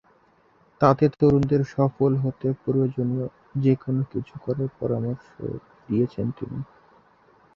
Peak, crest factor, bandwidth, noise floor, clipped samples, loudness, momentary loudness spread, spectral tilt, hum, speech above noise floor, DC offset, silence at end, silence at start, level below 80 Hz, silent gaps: -2 dBFS; 22 dB; 6.8 kHz; -60 dBFS; under 0.1%; -24 LUFS; 15 LU; -10 dB/octave; none; 37 dB; under 0.1%; 0.9 s; 0.8 s; -54 dBFS; none